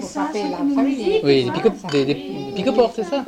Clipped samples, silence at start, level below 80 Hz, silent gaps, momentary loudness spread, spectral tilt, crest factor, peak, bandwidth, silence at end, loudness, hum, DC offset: under 0.1%; 0 s; -52 dBFS; none; 7 LU; -6 dB/octave; 16 dB; -4 dBFS; 10.5 kHz; 0 s; -20 LUFS; none; under 0.1%